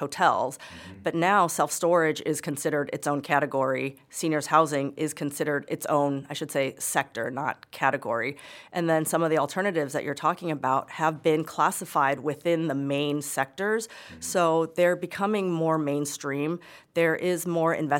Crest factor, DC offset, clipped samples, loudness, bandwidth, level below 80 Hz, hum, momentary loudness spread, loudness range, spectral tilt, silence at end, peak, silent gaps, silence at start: 20 dB; under 0.1%; under 0.1%; -26 LUFS; 17 kHz; -72 dBFS; none; 8 LU; 2 LU; -4.5 dB/octave; 0 s; -6 dBFS; none; 0 s